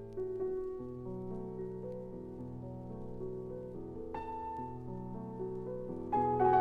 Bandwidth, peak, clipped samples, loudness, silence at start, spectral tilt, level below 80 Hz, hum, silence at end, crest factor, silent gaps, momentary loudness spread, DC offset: 4.9 kHz; -18 dBFS; under 0.1%; -40 LUFS; 0 s; -10 dB/octave; -56 dBFS; none; 0 s; 20 dB; none; 11 LU; under 0.1%